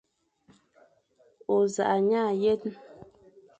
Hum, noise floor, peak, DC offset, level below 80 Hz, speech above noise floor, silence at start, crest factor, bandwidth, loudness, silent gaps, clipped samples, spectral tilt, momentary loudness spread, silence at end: none; -64 dBFS; -14 dBFS; under 0.1%; -70 dBFS; 39 dB; 1.5 s; 16 dB; 8.6 kHz; -26 LUFS; none; under 0.1%; -5.5 dB/octave; 16 LU; 0.55 s